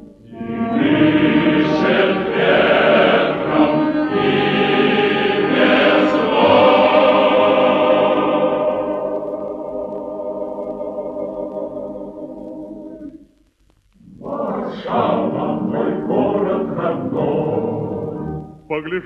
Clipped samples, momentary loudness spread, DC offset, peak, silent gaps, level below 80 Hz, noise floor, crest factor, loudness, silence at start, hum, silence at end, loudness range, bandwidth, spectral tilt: under 0.1%; 16 LU; under 0.1%; 0 dBFS; none; -50 dBFS; -57 dBFS; 16 dB; -16 LUFS; 0 s; none; 0 s; 15 LU; 7 kHz; -7.5 dB/octave